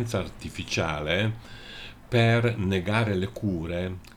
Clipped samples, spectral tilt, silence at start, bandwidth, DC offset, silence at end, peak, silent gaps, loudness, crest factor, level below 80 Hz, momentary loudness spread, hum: under 0.1%; -6 dB/octave; 0 s; 14 kHz; under 0.1%; 0.05 s; -8 dBFS; none; -27 LUFS; 18 dB; -48 dBFS; 18 LU; none